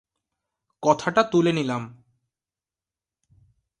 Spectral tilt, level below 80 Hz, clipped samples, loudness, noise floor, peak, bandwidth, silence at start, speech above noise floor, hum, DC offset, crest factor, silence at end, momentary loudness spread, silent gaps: -5.5 dB/octave; -66 dBFS; under 0.1%; -22 LUFS; under -90 dBFS; -4 dBFS; 11 kHz; 0.8 s; over 68 dB; none; under 0.1%; 22 dB; 1.85 s; 11 LU; none